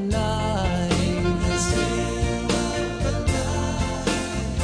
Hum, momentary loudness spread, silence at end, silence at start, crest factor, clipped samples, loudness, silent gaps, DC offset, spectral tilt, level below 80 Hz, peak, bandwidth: none; 3 LU; 0 s; 0 s; 14 dB; under 0.1%; -24 LUFS; none; under 0.1%; -5 dB/octave; -30 dBFS; -8 dBFS; 10.5 kHz